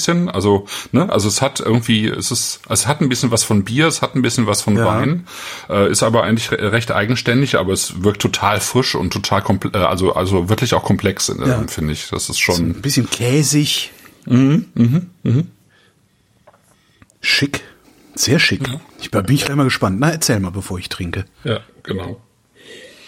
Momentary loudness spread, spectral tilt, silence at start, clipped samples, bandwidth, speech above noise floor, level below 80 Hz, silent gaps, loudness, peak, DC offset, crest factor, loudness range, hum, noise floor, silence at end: 10 LU; -4.5 dB/octave; 0 s; under 0.1%; 16.5 kHz; 41 dB; -44 dBFS; none; -16 LUFS; 0 dBFS; under 0.1%; 16 dB; 3 LU; none; -57 dBFS; 0.2 s